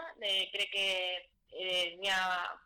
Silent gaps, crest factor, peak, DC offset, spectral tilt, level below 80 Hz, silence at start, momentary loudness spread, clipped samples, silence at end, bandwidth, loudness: none; 10 dB; -26 dBFS; under 0.1%; -0.5 dB/octave; -72 dBFS; 0 s; 9 LU; under 0.1%; 0.1 s; 18.5 kHz; -33 LUFS